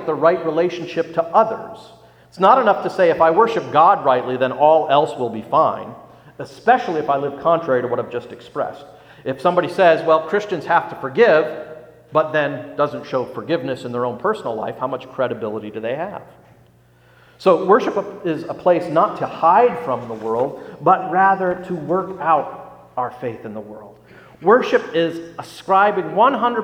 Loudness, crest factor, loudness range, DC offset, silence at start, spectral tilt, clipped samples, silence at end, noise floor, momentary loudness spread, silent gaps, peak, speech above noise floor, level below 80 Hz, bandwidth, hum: -18 LUFS; 18 dB; 7 LU; under 0.1%; 0 s; -6.5 dB/octave; under 0.1%; 0 s; -52 dBFS; 15 LU; none; 0 dBFS; 34 dB; -62 dBFS; 10.5 kHz; none